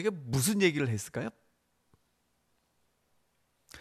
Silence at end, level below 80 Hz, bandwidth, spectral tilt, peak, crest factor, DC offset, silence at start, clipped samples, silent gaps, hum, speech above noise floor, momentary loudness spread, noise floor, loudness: 0 s; -64 dBFS; 15.5 kHz; -4.5 dB/octave; -14 dBFS; 22 dB; under 0.1%; 0 s; under 0.1%; none; 60 Hz at -65 dBFS; 45 dB; 12 LU; -75 dBFS; -30 LUFS